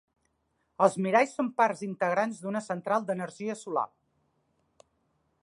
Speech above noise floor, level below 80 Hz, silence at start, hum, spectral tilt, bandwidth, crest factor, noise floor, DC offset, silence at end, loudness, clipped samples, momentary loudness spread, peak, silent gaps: 47 dB; -80 dBFS; 0.8 s; none; -5.5 dB/octave; 11.5 kHz; 22 dB; -76 dBFS; under 0.1%; 1.55 s; -29 LUFS; under 0.1%; 9 LU; -8 dBFS; none